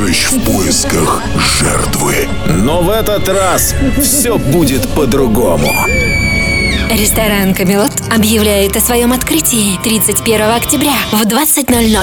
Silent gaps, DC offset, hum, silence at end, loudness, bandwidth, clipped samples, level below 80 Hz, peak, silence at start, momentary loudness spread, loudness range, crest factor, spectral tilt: none; under 0.1%; none; 0 s; -10 LUFS; over 20 kHz; under 0.1%; -22 dBFS; 0 dBFS; 0 s; 3 LU; 1 LU; 10 dB; -3.5 dB/octave